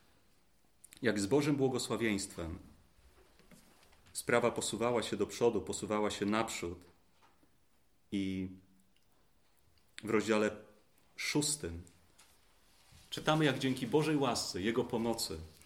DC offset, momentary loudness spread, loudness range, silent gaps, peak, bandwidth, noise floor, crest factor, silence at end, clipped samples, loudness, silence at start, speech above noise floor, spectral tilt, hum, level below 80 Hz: under 0.1%; 14 LU; 6 LU; none; -14 dBFS; 16.5 kHz; -74 dBFS; 22 dB; 0.15 s; under 0.1%; -34 LUFS; 1 s; 40 dB; -4.5 dB/octave; none; -64 dBFS